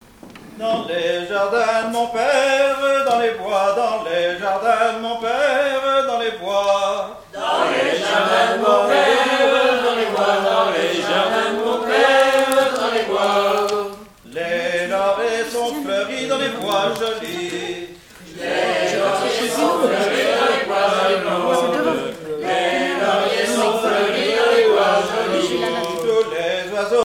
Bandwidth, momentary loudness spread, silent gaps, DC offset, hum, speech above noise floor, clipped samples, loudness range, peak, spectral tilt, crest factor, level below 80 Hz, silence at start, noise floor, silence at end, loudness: 17 kHz; 8 LU; none; under 0.1%; none; 23 dB; under 0.1%; 5 LU; 0 dBFS; -3 dB/octave; 18 dB; -56 dBFS; 0.25 s; -41 dBFS; 0 s; -18 LUFS